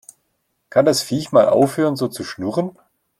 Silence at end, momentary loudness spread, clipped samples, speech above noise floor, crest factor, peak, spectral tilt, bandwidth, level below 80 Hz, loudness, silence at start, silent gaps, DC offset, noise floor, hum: 0.5 s; 10 LU; under 0.1%; 53 dB; 16 dB; -2 dBFS; -5 dB/octave; 15.5 kHz; -60 dBFS; -18 LUFS; 0.75 s; none; under 0.1%; -70 dBFS; none